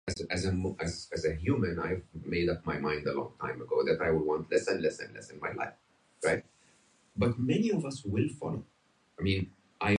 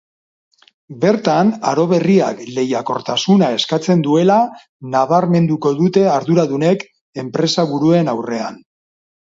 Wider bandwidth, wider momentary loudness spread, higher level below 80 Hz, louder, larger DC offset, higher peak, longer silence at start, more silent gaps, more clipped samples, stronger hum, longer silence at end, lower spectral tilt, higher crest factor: first, 11 kHz vs 7.8 kHz; about the same, 10 LU vs 8 LU; first, -50 dBFS vs -60 dBFS; second, -32 LUFS vs -15 LUFS; neither; second, -14 dBFS vs 0 dBFS; second, 0.05 s vs 0.9 s; second, none vs 4.69-4.80 s, 7.01-7.13 s; neither; neither; second, 0 s vs 0.7 s; about the same, -6 dB/octave vs -6.5 dB/octave; about the same, 18 dB vs 16 dB